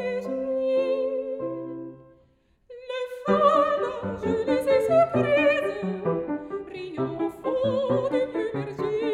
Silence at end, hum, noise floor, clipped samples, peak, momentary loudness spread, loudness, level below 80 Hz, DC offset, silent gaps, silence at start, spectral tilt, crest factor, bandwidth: 0 s; none; -62 dBFS; under 0.1%; -8 dBFS; 14 LU; -25 LUFS; -58 dBFS; under 0.1%; none; 0 s; -7 dB/octave; 18 dB; 13 kHz